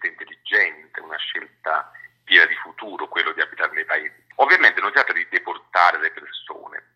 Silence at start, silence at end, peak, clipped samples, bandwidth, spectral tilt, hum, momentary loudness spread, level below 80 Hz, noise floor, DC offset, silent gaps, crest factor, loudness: 0 s; 0.15 s; 0 dBFS; under 0.1%; 12 kHz; -1.5 dB/octave; none; 20 LU; -82 dBFS; -43 dBFS; under 0.1%; none; 22 dB; -19 LUFS